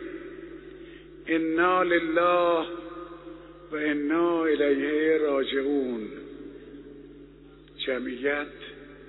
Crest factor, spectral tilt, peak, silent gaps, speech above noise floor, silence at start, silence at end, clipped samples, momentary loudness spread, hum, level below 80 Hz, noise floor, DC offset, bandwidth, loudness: 18 dB; -2.5 dB/octave; -10 dBFS; none; 25 dB; 0 s; 0 s; under 0.1%; 22 LU; none; -58 dBFS; -50 dBFS; under 0.1%; 4.1 kHz; -26 LUFS